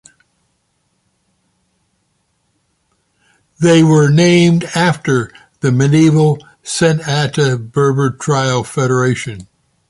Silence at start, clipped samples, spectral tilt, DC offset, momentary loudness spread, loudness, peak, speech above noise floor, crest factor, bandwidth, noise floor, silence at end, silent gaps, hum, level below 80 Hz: 3.6 s; under 0.1%; -6 dB/octave; under 0.1%; 10 LU; -13 LUFS; -2 dBFS; 52 dB; 14 dB; 11.5 kHz; -64 dBFS; 0.45 s; none; none; -50 dBFS